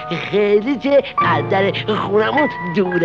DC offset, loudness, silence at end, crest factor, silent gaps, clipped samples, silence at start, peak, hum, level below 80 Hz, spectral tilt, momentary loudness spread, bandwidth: 0.2%; -17 LUFS; 0 s; 12 dB; none; under 0.1%; 0 s; -4 dBFS; none; -52 dBFS; -7.5 dB/octave; 4 LU; 6.8 kHz